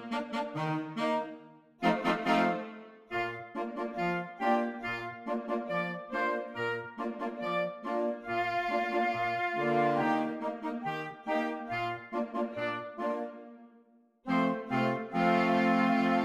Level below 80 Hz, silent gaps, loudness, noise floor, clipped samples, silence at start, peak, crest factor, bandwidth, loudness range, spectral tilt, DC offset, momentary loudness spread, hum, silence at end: -68 dBFS; none; -32 LUFS; -63 dBFS; under 0.1%; 0 s; -14 dBFS; 18 dB; 13 kHz; 4 LU; -6.5 dB/octave; under 0.1%; 10 LU; none; 0 s